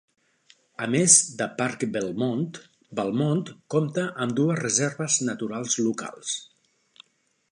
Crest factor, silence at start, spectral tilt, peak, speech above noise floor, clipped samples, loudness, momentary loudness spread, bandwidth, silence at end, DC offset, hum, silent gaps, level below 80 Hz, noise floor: 24 dB; 0.8 s; -3.5 dB/octave; -2 dBFS; 45 dB; under 0.1%; -24 LUFS; 16 LU; 11 kHz; 1.05 s; under 0.1%; none; none; -70 dBFS; -70 dBFS